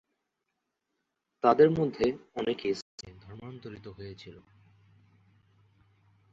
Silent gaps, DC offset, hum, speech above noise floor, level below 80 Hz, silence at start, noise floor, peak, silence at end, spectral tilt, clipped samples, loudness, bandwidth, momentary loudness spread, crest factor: 2.82-2.98 s; under 0.1%; none; 55 dB; -64 dBFS; 1.45 s; -83 dBFS; -8 dBFS; 2 s; -7 dB/octave; under 0.1%; -27 LUFS; 7.8 kHz; 25 LU; 24 dB